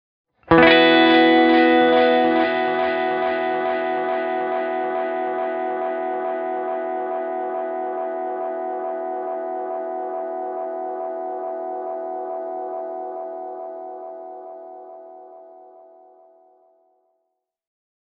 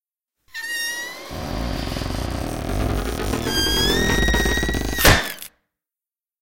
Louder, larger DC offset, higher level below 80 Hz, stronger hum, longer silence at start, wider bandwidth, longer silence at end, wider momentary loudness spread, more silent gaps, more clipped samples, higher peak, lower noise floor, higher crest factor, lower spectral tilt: about the same, -20 LUFS vs -21 LUFS; neither; second, -56 dBFS vs -28 dBFS; neither; first, 0.5 s vs 0 s; second, 5.4 kHz vs 17 kHz; first, 2.35 s vs 0 s; first, 19 LU vs 15 LU; neither; neither; about the same, 0 dBFS vs 0 dBFS; second, -76 dBFS vs under -90 dBFS; about the same, 22 dB vs 22 dB; second, -2 dB/octave vs -3.5 dB/octave